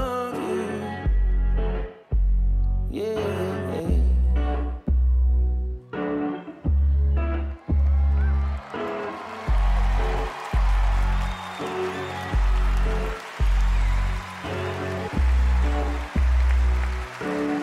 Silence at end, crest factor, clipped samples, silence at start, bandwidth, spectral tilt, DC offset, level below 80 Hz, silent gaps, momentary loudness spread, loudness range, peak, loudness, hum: 0 s; 10 dB; under 0.1%; 0 s; 9.6 kHz; -7 dB/octave; under 0.1%; -22 dBFS; none; 8 LU; 2 LU; -12 dBFS; -25 LUFS; none